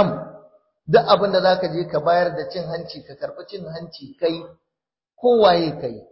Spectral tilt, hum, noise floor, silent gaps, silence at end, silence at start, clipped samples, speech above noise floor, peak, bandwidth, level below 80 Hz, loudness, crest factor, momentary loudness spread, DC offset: -10 dB/octave; none; -86 dBFS; none; 0.1 s; 0 s; under 0.1%; 66 dB; -2 dBFS; 5.8 kHz; -60 dBFS; -19 LUFS; 18 dB; 19 LU; under 0.1%